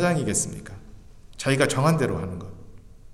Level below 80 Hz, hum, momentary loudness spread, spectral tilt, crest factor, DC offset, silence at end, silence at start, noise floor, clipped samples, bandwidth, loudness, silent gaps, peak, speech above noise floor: -48 dBFS; none; 22 LU; -4.5 dB/octave; 20 dB; under 0.1%; 0 s; 0 s; -44 dBFS; under 0.1%; 14.5 kHz; -24 LUFS; none; -6 dBFS; 21 dB